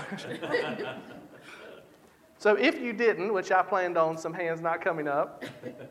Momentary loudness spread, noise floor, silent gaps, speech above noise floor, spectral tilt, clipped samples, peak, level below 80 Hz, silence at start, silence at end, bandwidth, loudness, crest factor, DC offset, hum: 22 LU; -58 dBFS; none; 29 dB; -5 dB/octave; under 0.1%; -10 dBFS; -76 dBFS; 0 s; 0 s; 14.5 kHz; -28 LUFS; 18 dB; under 0.1%; none